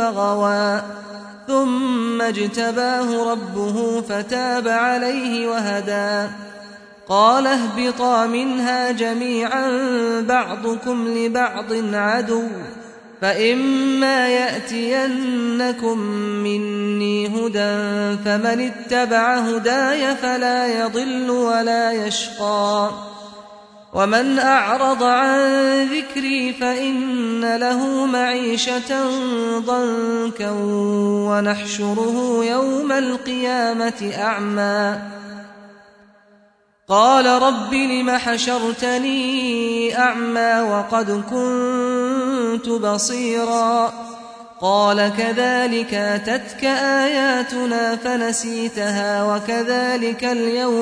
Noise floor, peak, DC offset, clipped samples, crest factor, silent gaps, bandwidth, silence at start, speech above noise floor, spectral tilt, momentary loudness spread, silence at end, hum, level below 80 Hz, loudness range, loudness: -57 dBFS; -2 dBFS; under 0.1%; under 0.1%; 18 dB; none; 10.5 kHz; 0 s; 38 dB; -4 dB/octave; 7 LU; 0 s; none; -62 dBFS; 3 LU; -19 LUFS